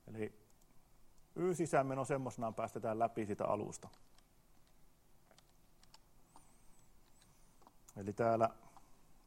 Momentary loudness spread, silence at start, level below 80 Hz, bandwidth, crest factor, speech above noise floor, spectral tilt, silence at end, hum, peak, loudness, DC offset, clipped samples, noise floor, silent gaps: 17 LU; 0.05 s; -70 dBFS; 16 kHz; 24 dB; 28 dB; -6.5 dB/octave; 0.1 s; none; -18 dBFS; -39 LUFS; under 0.1%; under 0.1%; -66 dBFS; none